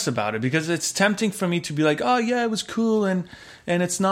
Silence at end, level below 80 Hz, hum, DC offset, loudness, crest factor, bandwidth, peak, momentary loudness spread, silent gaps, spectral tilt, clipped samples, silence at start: 0 s; -62 dBFS; none; under 0.1%; -23 LUFS; 18 dB; 16 kHz; -4 dBFS; 5 LU; none; -4.5 dB/octave; under 0.1%; 0 s